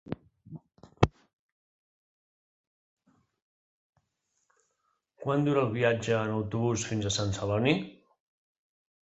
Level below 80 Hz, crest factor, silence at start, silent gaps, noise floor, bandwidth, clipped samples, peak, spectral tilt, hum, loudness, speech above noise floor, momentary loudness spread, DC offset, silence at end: -52 dBFS; 30 dB; 0.05 s; 1.33-2.97 s, 3.42-3.93 s; -78 dBFS; 8.2 kHz; under 0.1%; -2 dBFS; -5.5 dB/octave; none; -29 LUFS; 50 dB; 19 LU; under 0.1%; 1.1 s